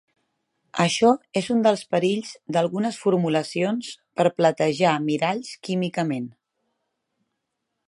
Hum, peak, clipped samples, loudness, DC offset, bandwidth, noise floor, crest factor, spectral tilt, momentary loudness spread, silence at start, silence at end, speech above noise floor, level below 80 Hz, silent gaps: none; -4 dBFS; under 0.1%; -23 LUFS; under 0.1%; 11.5 kHz; -80 dBFS; 20 dB; -5.5 dB/octave; 10 LU; 0.75 s; 1.55 s; 57 dB; -70 dBFS; none